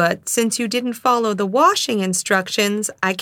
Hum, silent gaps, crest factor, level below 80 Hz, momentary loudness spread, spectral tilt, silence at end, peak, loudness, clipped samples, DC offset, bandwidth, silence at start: none; none; 18 dB; -68 dBFS; 5 LU; -3 dB/octave; 0 s; 0 dBFS; -18 LUFS; under 0.1%; under 0.1%; 18.5 kHz; 0 s